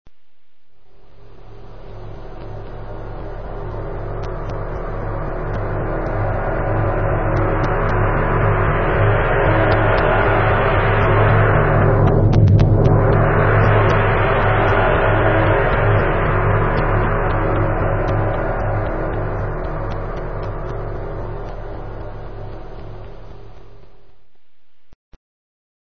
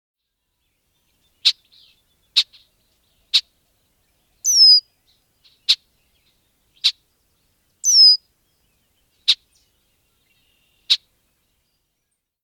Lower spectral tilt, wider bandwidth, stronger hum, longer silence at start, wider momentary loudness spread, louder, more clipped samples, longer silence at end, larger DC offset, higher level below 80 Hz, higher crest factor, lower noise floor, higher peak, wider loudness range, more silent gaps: first, -9 dB/octave vs 6.5 dB/octave; second, 6 kHz vs 19.5 kHz; neither; second, 0.05 s vs 1.45 s; first, 19 LU vs 13 LU; about the same, -17 LUFS vs -15 LUFS; neither; second, 0.7 s vs 1.45 s; first, 2% vs under 0.1%; first, -26 dBFS vs -72 dBFS; second, 16 dB vs 22 dB; second, -67 dBFS vs -76 dBFS; about the same, 0 dBFS vs 0 dBFS; first, 18 LU vs 8 LU; first, 24.95-25.12 s vs none